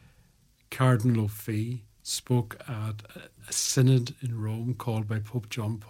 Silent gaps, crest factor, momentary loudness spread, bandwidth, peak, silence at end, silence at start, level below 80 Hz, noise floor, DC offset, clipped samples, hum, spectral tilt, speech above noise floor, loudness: none; 20 dB; 14 LU; 17 kHz; -10 dBFS; 0 s; 0.7 s; -62 dBFS; -63 dBFS; under 0.1%; under 0.1%; none; -5.5 dB/octave; 35 dB; -28 LUFS